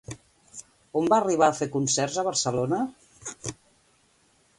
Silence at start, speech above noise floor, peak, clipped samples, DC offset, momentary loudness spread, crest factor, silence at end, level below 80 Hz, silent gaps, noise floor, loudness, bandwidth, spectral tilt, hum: 0.1 s; 39 dB; -6 dBFS; under 0.1%; under 0.1%; 22 LU; 22 dB; 1.05 s; -62 dBFS; none; -64 dBFS; -25 LUFS; 11.5 kHz; -4 dB/octave; none